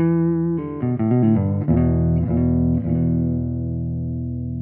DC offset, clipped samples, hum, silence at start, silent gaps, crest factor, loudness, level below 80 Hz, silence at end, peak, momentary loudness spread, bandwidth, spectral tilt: under 0.1%; under 0.1%; none; 0 s; none; 12 dB; -20 LUFS; -34 dBFS; 0 s; -6 dBFS; 8 LU; 3 kHz; -12.5 dB/octave